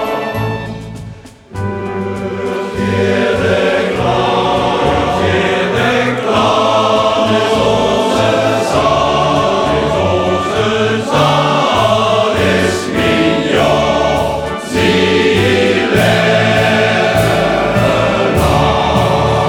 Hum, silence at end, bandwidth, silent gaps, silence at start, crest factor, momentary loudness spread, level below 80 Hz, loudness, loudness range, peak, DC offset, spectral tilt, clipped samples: none; 0 s; 19.5 kHz; none; 0 s; 12 dB; 8 LU; -32 dBFS; -12 LUFS; 3 LU; 0 dBFS; under 0.1%; -5.5 dB/octave; under 0.1%